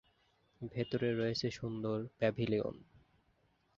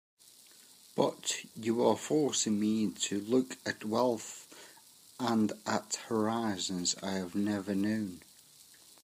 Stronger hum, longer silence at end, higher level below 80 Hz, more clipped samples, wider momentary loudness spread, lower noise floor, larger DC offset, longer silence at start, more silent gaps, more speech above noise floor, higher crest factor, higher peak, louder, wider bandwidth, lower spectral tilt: neither; about the same, 0.95 s vs 0.85 s; first, -66 dBFS vs -78 dBFS; neither; about the same, 10 LU vs 11 LU; first, -74 dBFS vs -58 dBFS; neither; second, 0.6 s vs 0.95 s; neither; first, 38 dB vs 26 dB; about the same, 20 dB vs 20 dB; second, -18 dBFS vs -14 dBFS; second, -37 LUFS vs -32 LUFS; second, 7.4 kHz vs 15.5 kHz; first, -5.5 dB/octave vs -4 dB/octave